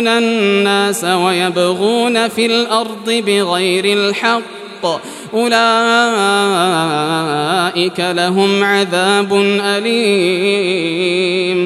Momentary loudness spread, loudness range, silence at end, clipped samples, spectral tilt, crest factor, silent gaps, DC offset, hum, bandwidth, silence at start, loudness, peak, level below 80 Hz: 5 LU; 1 LU; 0 s; under 0.1%; -4 dB/octave; 14 dB; none; under 0.1%; none; 14 kHz; 0 s; -13 LUFS; 0 dBFS; -66 dBFS